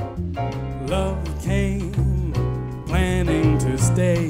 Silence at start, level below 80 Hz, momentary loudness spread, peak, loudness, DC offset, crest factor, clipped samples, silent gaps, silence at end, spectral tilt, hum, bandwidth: 0 s; -28 dBFS; 8 LU; -6 dBFS; -22 LUFS; under 0.1%; 14 dB; under 0.1%; none; 0 s; -6.5 dB/octave; none; 16 kHz